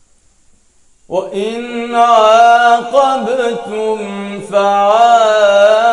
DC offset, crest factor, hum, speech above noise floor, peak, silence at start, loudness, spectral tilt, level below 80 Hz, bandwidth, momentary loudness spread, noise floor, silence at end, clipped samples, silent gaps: under 0.1%; 12 dB; none; 38 dB; 0 dBFS; 1.1 s; -11 LUFS; -3.5 dB/octave; -56 dBFS; 11 kHz; 13 LU; -50 dBFS; 0 s; 0.3%; none